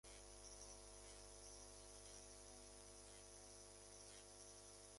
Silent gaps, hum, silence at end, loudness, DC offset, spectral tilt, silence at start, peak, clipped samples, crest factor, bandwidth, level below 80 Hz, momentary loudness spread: none; 50 Hz at -70 dBFS; 0 s; -59 LUFS; under 0.1%; -2 dB/octave; 0.05 s; -44 dBFS; under 0.1%; 16 dB; 11.5 kHz; -70 dBFS; 2 LU